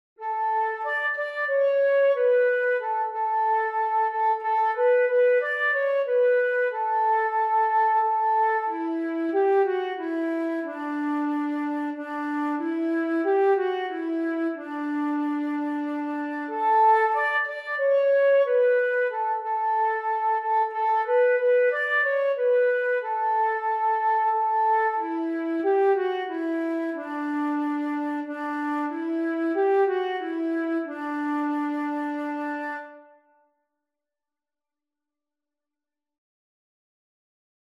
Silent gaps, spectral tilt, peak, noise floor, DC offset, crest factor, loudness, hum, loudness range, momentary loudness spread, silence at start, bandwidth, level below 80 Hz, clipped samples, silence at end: none; -4.5 dB/octave; -10 dBFS; under -90 dBFS; under 0.1%; 14 dB; -24 LUFS; none; 6 LU; 9 LU; 0.2 s; 5.8 kHz; under -90 dBFS; under 0.1%; 4.6 s